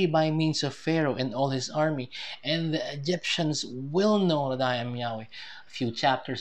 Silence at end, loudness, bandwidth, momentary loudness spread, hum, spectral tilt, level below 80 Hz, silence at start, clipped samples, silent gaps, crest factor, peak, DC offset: 0 s; -28 LUFS; 9.6 kHz; 9 LU; none; -5 dB/octave; -70 dBFS; 0 s; under 0.1%; none; 18 dB; -10 dBFS; 0.3%